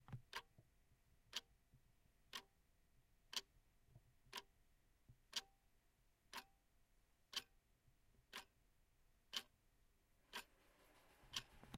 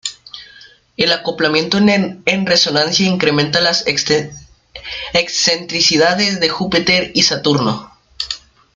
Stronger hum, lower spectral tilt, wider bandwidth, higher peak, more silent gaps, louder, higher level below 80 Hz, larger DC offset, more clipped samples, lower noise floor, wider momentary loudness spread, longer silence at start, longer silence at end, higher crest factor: neither; second, -1 dB/octave vs -3.5 dB/octave; first, 16 kHz vs 9.4 kHz; second, -30 dBFS vs 0 dBFS; neither; second, -54 LUFS vs -14 LUFS; second, -78 dBFS vs -48 dBFS; neither; neither; first, -79 dBFS vs -44 dBFS; second, 7 LU vs 14 LU; about the same, 0 s vs 0.05 s; second, 0 s vs 0.4 s; first, 30 dB vs 16 dB